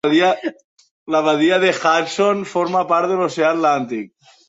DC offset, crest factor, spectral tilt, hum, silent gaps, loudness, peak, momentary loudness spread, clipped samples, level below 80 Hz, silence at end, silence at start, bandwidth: under 0.1%; 16 dB; -4.5 dB/octave; none; 0.64-0.77 s, 0.91-1.06 s; -17 LUFS; -2 dBFS; 10 LU; under 0.1%; -66 dBFS; 0.4 s; 0.05 s; 8 kHz